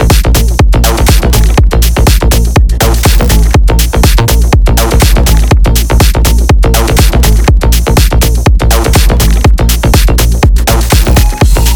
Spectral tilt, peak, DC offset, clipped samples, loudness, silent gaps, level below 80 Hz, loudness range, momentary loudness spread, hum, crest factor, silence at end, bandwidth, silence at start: -4.5 dB/octave; 0 dBFS; 1%; 0.2%; -8 LUFS; none; -6 dBFS; 0 LU; 1 LU; none; 6 dB; 0 s; over 20 kHz; 0 s